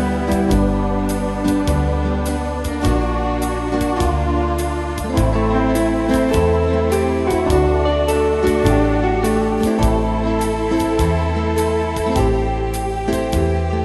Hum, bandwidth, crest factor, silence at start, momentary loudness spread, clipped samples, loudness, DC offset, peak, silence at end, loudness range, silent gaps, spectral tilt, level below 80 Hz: none; 12.5 kHz; 16 dB; 0 s; 5 LU; under 0.1%; -18 LUFS; under 0.1%; -2 dBFS; 0 s; 3 LU; none; -6.5 dB/octave; -24 dBFS